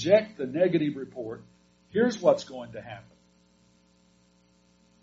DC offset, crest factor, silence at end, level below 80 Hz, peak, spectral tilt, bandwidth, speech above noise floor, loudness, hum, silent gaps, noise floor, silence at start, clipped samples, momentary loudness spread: under 0.1%; 22 dB; 2 s; -68 dBFS; -8 dBFS; -5 dB/octave; 7.6 kHz; 37 dB; -27 LUFS; 60 Hz at -55 dBFS; none; -63 dBFS; 0 s; under 0.1%; 20 LU